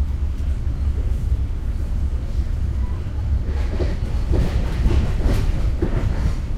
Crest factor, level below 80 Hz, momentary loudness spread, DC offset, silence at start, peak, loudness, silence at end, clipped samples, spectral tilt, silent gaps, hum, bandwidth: 14 dB; -20 dBFS; 5 LU; under 0.1%; 0 s; -6 dBFS; -23 LUFS; 0 s; under 0.1%; -7.5 dB/octave; none; none; 10 kHz